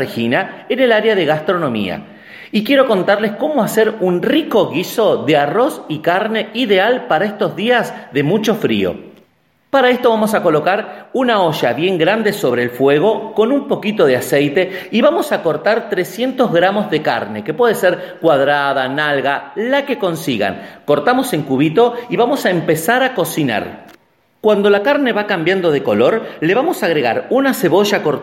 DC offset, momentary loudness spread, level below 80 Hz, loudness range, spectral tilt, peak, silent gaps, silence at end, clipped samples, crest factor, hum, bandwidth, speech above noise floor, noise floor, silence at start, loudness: under 0.1%; 6 LU; -60 dBFS; 1 LU; -5 dB/octave; 0 dBFS; none; 0 s; under 0.1%; 14 dB; none; 16.5 kHz; 42 dB; -57 dBFS; 0 s; -15 LUFS